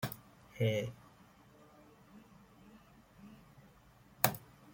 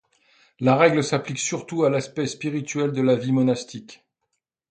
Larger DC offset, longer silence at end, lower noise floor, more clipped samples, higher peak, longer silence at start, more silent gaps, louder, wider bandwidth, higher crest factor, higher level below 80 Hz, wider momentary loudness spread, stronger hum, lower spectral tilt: neither; second, 0.3 s vs 0.75 s; second, -63 dBFS vs -78 dBFS; neither; second, -10 dBFS vs -2 dBFS; second, 0 s vs 0.6 s; neither; second, -36 LUFS vs -22 LUFS; first, 16.5 kHz vs 9.4 kHz; first, 34 dB vs 20 dB; about the same, -70 dBFS vs -66 dBFS; first, 28 LU vs 11 LU; neither; about the same, -4.5 dB/octave vs -5.5 dB/octave